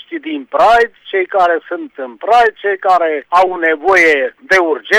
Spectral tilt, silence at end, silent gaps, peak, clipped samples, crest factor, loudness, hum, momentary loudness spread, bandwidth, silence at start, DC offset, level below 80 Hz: -3 dB/octave; 0 s; none; -2 dBFS; under 0.1%; 10 dB; -12 LUFS; none; 13 LU; 14 kHz; 0.1 s; under 0.1%; -48 dBFS